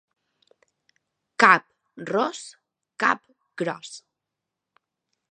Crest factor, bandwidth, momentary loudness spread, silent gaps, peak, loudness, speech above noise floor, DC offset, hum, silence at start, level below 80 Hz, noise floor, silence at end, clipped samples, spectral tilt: 28 dB; 10.5 kHz; 25 LU; none; 0 dBFS; -22 LUFS; 62 dB; under 0.1%; none; 1.4 s; -74 dBFS; -85 dBFS; 1.35 s; under 0.1%; -3.5 dB/octave